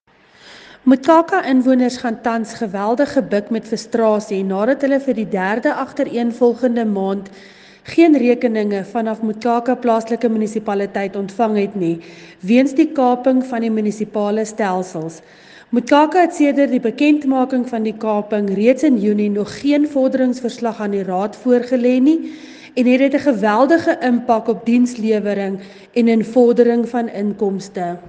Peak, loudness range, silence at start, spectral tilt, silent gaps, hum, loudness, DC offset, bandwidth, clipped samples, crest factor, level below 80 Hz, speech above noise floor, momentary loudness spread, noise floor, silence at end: 0 dBFS; 3 LU; 0.45 s; -6.5 dB/octave; none; none; -17 LUFS; under 0.1%; 9.2 kHz; under 0.1%; 16 dB; -62 dBFS; 31 dB; 9 LU; -47 dBFS; 0 s